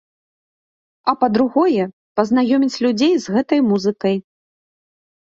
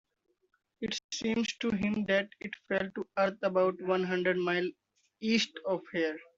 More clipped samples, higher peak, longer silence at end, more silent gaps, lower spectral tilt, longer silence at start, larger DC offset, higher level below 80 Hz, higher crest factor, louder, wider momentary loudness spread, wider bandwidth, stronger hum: neither; first, 0 dBFS vs -16 dBFS; first, 1.05 s vs 0.15 s; first, 1.93-2.15 s vs 1.04-1.09 s; first, -6 dB/octave vs -4.5 dB/octave; first, 1.05 s vs 0.8 s; neither; first, -62 dBFS vs -68 dBFS; about the same, 18 dB vs 18 dB; first, -18 LUFS vs -32 LUFS; about the same, 6 LU vs 8 LU; about the same, 7.6 kHz vs 7.8 kHz; neither